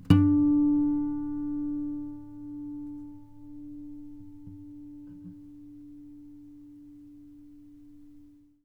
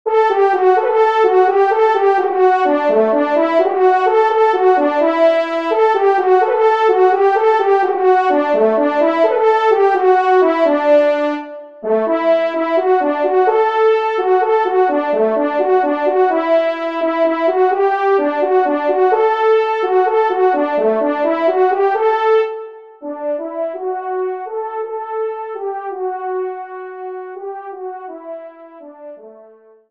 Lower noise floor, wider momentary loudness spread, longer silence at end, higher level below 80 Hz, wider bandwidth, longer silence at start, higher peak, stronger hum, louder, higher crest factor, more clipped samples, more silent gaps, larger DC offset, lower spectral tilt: first, -54 dBFS vs -45 dBFS; first, 27 LU vs 12 LU; second, 0.4 s vs 0.6 s; first, -54 dBFS vs -68 dBFS; second, 5 kHz vs 6.6 kHz; about the same, 0 s vs 0.05 s; second, -6 dBFS vs -2 dBFS; neither; second, -28 LUFS vs -14 LUFS; first, 24 dB vs 14 dB; neither; neither; second, under 0.1% vs 0.3%; first, -9 dB/octave vs -5.5 dB/octave